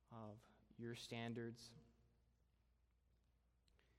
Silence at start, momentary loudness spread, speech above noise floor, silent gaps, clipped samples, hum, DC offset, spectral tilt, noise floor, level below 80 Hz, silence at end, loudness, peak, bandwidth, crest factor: 0.1 s; 15 LU; 29 dB; none; under 0.1%; none; under 0.1%; -5.5 dB/octave; -80 dBFS; -80 dBFS; 0.2 s; -54 LUFS; -36 dBFS; 13.5 kHz; 22 dB